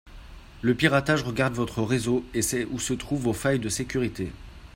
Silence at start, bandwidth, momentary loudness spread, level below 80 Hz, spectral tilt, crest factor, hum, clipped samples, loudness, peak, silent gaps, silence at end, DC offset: 0.05 s; 16 kHz; 8 LU; -46 dBFS; -4.5 dB/octave; 22 dB; none; under 0.1%; -26 LUFS; -4 dBFS; none; 0.05 s; under 0.1%